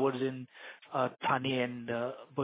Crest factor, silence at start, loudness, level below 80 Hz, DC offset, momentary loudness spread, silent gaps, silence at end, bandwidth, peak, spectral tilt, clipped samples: 18 dB; 0 s; -34 LUFS; -76 dBFS; under 0.1%; 14 LU; none; 0 s; 4 kHz; -16 dBFS; -4 dB/octave; under 0.1%